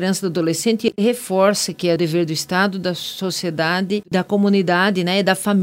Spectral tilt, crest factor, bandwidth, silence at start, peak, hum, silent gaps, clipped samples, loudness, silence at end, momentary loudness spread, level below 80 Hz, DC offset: -4.5 dB/octave; 18 dB; 16.5 kHz; 0 s; 0 dBFS; none; none; under 0.1%; -19 LUFS; 0 s; 6 LU; -62 dBFS; under 0.1%